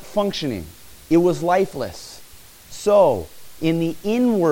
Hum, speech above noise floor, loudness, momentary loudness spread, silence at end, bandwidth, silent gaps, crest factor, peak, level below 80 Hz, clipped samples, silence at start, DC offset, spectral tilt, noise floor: none; 25 dB; -20 LUFS; 23 LU; 0 s; 17 kHz; none; 16 dB; -4 dBFS; -50 dBFS; under 0.1%; 0 s; under 0.1%; -6 dB/octave; -44 dBFS